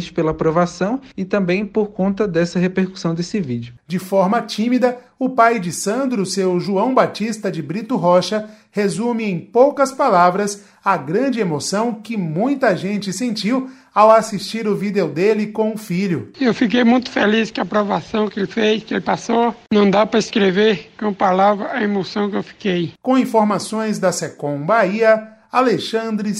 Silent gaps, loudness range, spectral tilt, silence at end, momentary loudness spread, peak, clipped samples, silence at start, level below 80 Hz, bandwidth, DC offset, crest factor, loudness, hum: none; 3 LU; -5.5 dB/octave; 0 s; 8 LU; 0 dBFS; under 0.1%; 0 s; -54 dBFS; 15 kHz; under 0.1%; 18 dB; -18 LUFS; none